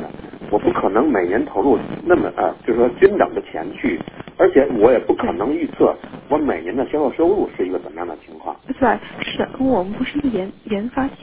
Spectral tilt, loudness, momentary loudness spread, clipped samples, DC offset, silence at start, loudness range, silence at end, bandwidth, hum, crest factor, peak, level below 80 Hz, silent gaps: -10.5 dB/octave; -19 LUFS; 14 LU; under 0.1%; under 0.1%; 0 s; 5 LU; 0 s; 4 kHz; none; 18 dB; 0 dBFS; -46 dBFS; none